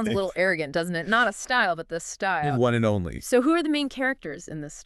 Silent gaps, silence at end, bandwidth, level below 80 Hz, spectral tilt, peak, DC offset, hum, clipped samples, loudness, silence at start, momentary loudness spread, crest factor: none; 0 s; 13.5 kHz; -52 dBFS; -5 dB/octave; -6 dBFS; under 0.1%; none; under 0.1%; -24 LUFS; 0 s; 10 LU; 18 dB